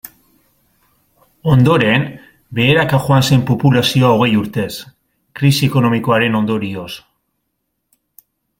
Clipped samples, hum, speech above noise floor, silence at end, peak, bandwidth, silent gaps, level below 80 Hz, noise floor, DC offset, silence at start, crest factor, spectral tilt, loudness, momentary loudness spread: under 0.1%; none; 58 dB; 1.6 s; 0 dBFS; 16.5 kHz; none; -48 dBFS; -72 dBFS; under 0.1%; 1.45 s; 16 dB; -6 dB/octave; -14 LUFS; 14 LU